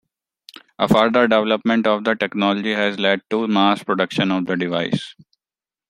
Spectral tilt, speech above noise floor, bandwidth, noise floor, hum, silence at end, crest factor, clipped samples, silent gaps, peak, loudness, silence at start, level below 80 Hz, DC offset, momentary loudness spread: -6 dB/octave; over 72 dB; 16 kHz; under -90 dBFS; none; 0.8 s; 18 dB; under 0.1%; none; -2 dBFS; -19 LUFS; 0.8 s; -58 dBFS; under 0.1%; 7 LU